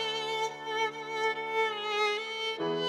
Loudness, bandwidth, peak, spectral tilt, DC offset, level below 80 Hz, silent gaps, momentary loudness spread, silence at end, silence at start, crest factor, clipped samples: -31 LUFS; 14.5 kHz; -18 dBFS; -2.5 dB/octave; under 0.1%; -86 dBFS; none; 4 LU; 0 s; 0 s; 14 dB; under 0.1%